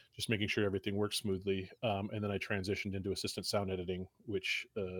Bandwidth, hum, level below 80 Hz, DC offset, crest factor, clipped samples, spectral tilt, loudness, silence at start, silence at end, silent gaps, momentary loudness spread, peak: 19 kHz; none; -70 dBFS; under 0.1%; 20 dB; under 0.1%; -4.5 dB/octave; -37 LUFS; 0.15 s; 0 s; none; 5 LU; -16 dBFS